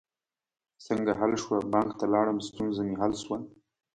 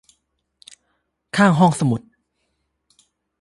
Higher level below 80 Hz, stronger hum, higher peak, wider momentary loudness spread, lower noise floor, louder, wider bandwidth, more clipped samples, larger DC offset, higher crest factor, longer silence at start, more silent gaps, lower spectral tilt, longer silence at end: about the same, -60 dBFS vs -60 dBFS; neither; second, -10 dBFS vs -2 dBFS; second, 8 LU vs 12 LU; first, under -90 dBFS vs -72 dBFS; second, -29 LUFS vs -18 LUFS; second, 9.4 kHz vs 11.5 kHz; neither; neither; about the same, 20 dB vs 20 dB; second, 0.8 s vs 1.35 s; neither; about the same, -5.5 dB/octave vs -6.5 dB/octave; second, 0.45 s vs 1.45 s